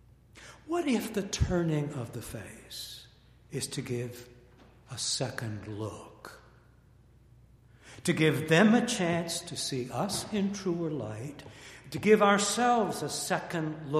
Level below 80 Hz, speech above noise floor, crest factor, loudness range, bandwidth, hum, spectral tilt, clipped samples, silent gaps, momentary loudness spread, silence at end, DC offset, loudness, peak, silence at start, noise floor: -52 dBFS; 29 dB; 22 dB; 10 LU; 15 kHz; none; -4.5 dB/octave; under 0.1%; none; 20 LU; 0 s; under 0.1%; -30 LUFS; -8 dBFS; 0.35 s; -59 dBFS